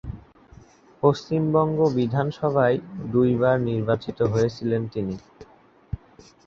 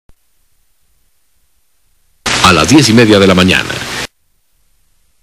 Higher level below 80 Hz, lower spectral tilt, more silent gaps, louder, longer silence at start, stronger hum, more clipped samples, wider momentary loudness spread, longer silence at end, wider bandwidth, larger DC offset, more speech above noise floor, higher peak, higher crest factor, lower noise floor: second, -48 dBFS vs -38 dBFS; first, -8 dB/octave vs -4 dB/octave; neither; second, -23 LUFS vs -8 LUFS; second, 0.05 s vs 2.25 s; neither; second, under 0.1% vs 0.4%; about the same, 17 LU vs 15 LU; second, 0.5 s vs 1.15 s; second, 7.4 kHz vs 16 kHz; second, under 0.1% vs 0.2%; second, 30 dB vs 52 dB; second, -4 dBFS vs 0 dBFS; first, 20 dB vs 12 dB; second, -52 dBFS vs -59 dBFS